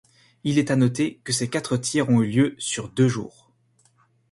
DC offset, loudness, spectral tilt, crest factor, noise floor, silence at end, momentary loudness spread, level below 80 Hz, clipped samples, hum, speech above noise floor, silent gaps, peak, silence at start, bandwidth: under 0.1%; -23 LUFS; -5 dB/octave; 16 dB; -63 dBFS; 1.05 s; 8 LU; -60 dBFS; under 0.1%; none; 41 dB; none; -8 dBFS; 0.45 s; 11.5 kHz